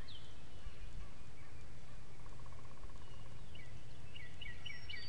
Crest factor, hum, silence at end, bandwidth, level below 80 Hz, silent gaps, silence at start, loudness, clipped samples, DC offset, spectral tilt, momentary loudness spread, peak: 16 dB; none; 0 s; 12 kHz; -56 dBFS; none; 0 s; -55 LUFS; under 0.1%; 2%; -4 dB/octave; 8 LU; -30 dBFS